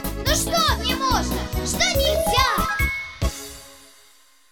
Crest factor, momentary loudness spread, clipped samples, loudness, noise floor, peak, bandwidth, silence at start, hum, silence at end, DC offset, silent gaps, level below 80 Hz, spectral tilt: 16 dB; 9 LU; under 0.1%; -21 LUFS; -55 dBFS; -6 dBFS; 19.5 kHz; 0 s; none; 0.75 s; 0.1%; none; -30 dBFS; -3 dB/octave